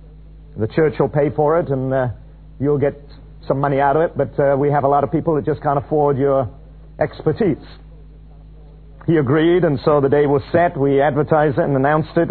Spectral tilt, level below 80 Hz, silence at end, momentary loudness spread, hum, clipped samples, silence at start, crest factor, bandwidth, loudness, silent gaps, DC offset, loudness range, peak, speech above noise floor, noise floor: -12 dB/octave; -40 dBFS; 0 s; 8 LU; none; under 0.1%; 0 s; 16 dB; 4.5 kHz; -17 LUFS; none; 0.2%; 5 LU; -2 dBFS; 23 dB; -40 dBFS